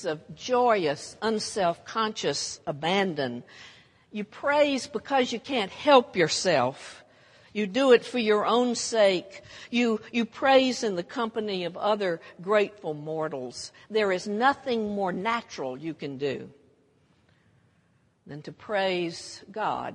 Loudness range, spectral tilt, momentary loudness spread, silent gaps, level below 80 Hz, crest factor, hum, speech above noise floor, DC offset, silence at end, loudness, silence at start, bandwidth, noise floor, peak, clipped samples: 10 LU; -4 dB/octave; 16 LU; none; -70 dBFS; 24 dB; none; 39 dB; under 0.1%; 0 s; -26 LUFS; 0 s; 11 kHz; -66 dBFS; -4 dBFS; under 0.1%